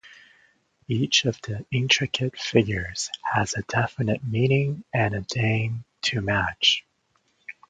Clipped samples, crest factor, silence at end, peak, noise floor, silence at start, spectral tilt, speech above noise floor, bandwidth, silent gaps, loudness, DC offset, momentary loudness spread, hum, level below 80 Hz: under 0.1%; 22 dB; 0.2 s; -4 dBFS; -69 dBFS; 0.05 s; -4 dB/octave; 44 dB; 9.2 kHz; none; -24 LUFS; under 0.1%; 8 LU; none; -50 dBFS